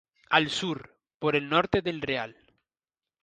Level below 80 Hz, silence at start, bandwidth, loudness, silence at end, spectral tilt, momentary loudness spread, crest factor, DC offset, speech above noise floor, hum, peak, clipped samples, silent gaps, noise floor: -58 dBFS; 0.3 s; 9.8 kHz; -27 LUFS; 0.9 s; -4.5 dB/octave; 9 LU; 24 dB; under 0.1%; over 63 dB; none; -6 dBFS; under 0.1%; 1.14-1.20 s; under -90 dBFS